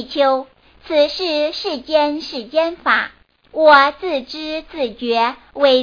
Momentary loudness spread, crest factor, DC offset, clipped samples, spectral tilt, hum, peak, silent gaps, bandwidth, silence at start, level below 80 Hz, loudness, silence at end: 14 LU; 18 dB; under 0.1%; under 0.1%; -3.5 dB/octave; none; 0 dBFS; none; 5.2 kHz; 0 s; -52 dBFS; -17 LUFS; 0 s